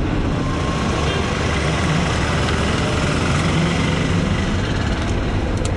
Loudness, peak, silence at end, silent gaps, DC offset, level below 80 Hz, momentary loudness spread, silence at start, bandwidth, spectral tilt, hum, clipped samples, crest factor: -19 LUFS; -4 dBFS; 0 s; none; under 0.1%; -28 dBFS; 3 LU; 0 s; 11.5 kHz; -5.5 dB/octave; none; under 0.1%; 14 dB